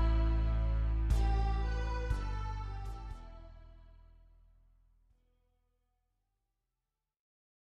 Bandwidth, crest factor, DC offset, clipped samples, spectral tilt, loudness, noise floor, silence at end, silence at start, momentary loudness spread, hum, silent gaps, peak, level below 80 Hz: 6.8 kHz; 16 dB; under 0.1%; under 0.1%; -7 dB/octave; -36 LUFS; -89 dBFS; 3.75 s; 0 s; 18 LU; none; none; -18 dBFS; -36 dBFS